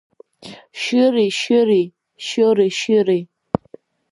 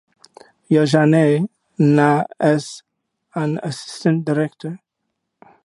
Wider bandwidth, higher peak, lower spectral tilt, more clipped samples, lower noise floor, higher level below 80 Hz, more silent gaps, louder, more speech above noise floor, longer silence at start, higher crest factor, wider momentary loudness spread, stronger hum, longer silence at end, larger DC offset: about the same, 11.5 kHz vs 11.5 kHz; about the same, 0 dBFS vs 0 dBFS; second, -5 dB/octave vs -7 dB/octave; neither; second, -46 dBFS vs -76 dBFS; first, -56 dBFS vs -66 dBFS; neither; about the same, -18 LUFS vs -18 LUFS; second, 29 dB vs 59 dB; second, 0.45 s vs 0.7 s; about the same, 18 dB vs 18 dB; second, 15 LU vs 18 LU; neither; about the same, 0.9 s vs 0.9 s; neither